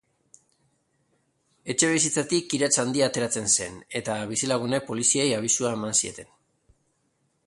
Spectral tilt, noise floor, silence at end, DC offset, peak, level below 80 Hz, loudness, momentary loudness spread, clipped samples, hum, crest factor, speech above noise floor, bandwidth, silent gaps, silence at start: -2.5 dB/octave; -71 dBFS; 1.25 s; under 0.1%; -6 dBFS; -64 dBFS; -24 LUFS; 9 LU; under 0.1%; none; 22 dB; 46 dB; 11.5 kHz; none; 1.65 s